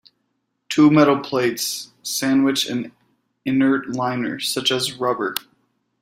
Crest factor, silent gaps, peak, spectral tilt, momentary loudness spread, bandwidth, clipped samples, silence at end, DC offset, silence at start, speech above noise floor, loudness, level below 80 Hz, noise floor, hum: 20 dB; none; -2 dBFS; -4 dB/octave; 11 LU; 16 kHz; under 0.1%; 0.6 s; under 0.1%; 0.7 s; 53 dB; -20 LUFS; -64 dBFS; -72 dBFS; none